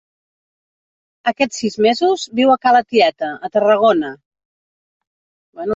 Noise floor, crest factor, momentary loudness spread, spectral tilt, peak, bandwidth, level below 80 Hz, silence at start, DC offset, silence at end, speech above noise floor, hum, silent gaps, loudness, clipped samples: under -90 dBFS; 16 dB; 10 LU; -4 dB/octave; -2 dBFS; 8 kHz; -64 dBFS; 1.25 s; under 0.1%; 0 s; over 75 dB; none; 4.26-4.31 s, 4.45-5.01 s, 5.07-5.53 s; -16 LUFS; under 0.1%